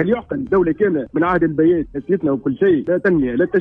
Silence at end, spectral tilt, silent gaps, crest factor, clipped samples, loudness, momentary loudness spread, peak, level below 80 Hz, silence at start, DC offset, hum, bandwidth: 0 s; -10 dB/octave; none; 12 dB; under 0.1%; -17 LUFS; 4 LU; -4 dBFS; -44 dBFS; 0 s; under 0.1%; none; 3.8 kHz